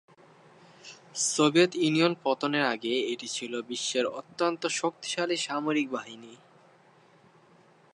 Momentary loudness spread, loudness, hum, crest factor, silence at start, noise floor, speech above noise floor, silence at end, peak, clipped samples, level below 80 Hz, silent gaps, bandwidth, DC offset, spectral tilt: 15 LU; -28 LUFS; none; 22 dB; 0.85 s; -59 dBFS; 31 dB; 1.6 s; -8 dBFS; under 0.1%; -84 dBFS; none; 11.5 kHz; under 0.1%; -3.5 dB/octave